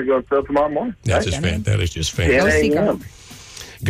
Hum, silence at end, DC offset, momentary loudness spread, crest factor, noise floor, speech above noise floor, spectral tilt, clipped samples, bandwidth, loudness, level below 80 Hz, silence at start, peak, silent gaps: none; 0 s; under 0.1%; 20 LU; 12 dB; -38 dBFS; 20 dB; -5.5 dB/octave; under 0.1%; 15.5 kHz; -19 LUFS; -34 dBFS; 0 s; -8 dBFS; none